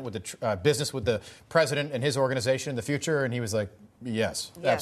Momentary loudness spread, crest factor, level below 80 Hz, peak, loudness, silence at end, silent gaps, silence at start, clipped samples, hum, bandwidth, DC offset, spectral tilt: 7 LU; 20 dB; -60 dBFS; -8 dBFS; -28 LUFS; 0 s; none; 0 s; under 0.1%; none; 13.5 kHz; under 0.1%; -4.5 dB/octave